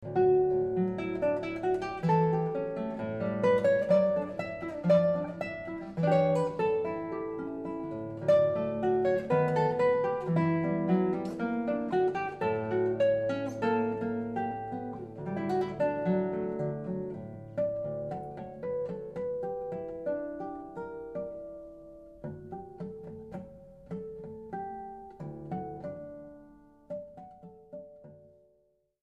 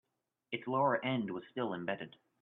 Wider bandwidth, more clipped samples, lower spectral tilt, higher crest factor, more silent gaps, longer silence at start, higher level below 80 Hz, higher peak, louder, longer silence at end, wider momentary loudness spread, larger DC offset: first, 8.6 kHz vs 4.1 kHz; neither; about the same, -8.5 dB/octave vs -9 dB/octave; about the same, 18 dB vs 18 dB; neither; second, 0 s vs 0.5 s; first, -62 dBFS vs -82 dBFS; first, -14 dBFS vs -18 dBFS; first, -31 LUFS vs -36 LUFS; first, 0.75 s vs 0.35 s; first, 18 LU vs 11 LU; neither